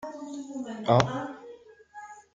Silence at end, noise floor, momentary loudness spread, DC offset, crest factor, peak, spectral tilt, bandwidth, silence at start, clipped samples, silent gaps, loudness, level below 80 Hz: 0.15 s; -50 dBFS; 23 LU; under 0.1%; 26 dB; -4 dBFS; -6 dB/octave; 7.8 kHz; 0 s; under 0.1%; none; -29 LUFS; -60 dBFS